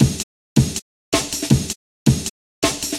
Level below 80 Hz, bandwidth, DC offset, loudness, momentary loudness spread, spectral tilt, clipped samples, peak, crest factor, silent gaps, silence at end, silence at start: -36 dBFS; 16 kHz; under 0.1%; -21 LUFS; 10 LU; -4.5 dB/octave; under 0.1%; 0 dBFS; 20 dB; 0.23-0.56 s, 0.82-1.12 s, 1.76-2.06 s, 2.30-2.62 s; 0 s; 0 s